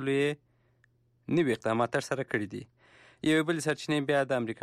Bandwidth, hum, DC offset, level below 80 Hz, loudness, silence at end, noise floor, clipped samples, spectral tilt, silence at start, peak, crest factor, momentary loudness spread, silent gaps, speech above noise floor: 14 kHz; none; under 0.1%; -70 dBFS; -30 LUFS; 0.1 s; -68 dBFS; under 0.1%; -5.5 dB/octave; 0 s; -16 dBFS; 14 dB; 10 LU; none; 39 dB